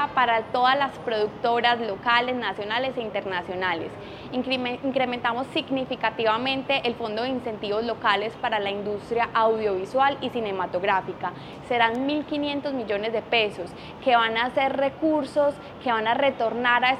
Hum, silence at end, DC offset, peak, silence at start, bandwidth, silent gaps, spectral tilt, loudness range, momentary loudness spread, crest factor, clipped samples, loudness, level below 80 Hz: none; 0 s; under 0.1%; -6 dBFS; 0 s; 11.5 kHz; none; -5.5 dB/octave; 3 LU; 7 LU; 20 dB; under 0.1%; -25 LUFS; -58 dBFS